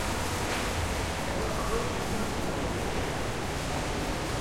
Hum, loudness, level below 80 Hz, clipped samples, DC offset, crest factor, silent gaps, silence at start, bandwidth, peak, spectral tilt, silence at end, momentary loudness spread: none; -31 LUFS; -40 dBFS; under 0.1%; under 0.1%; 14 dB; none; 0 s; 16.5 kHz; -16 dBFS; -4 dB/octave; 0 s; 2 LU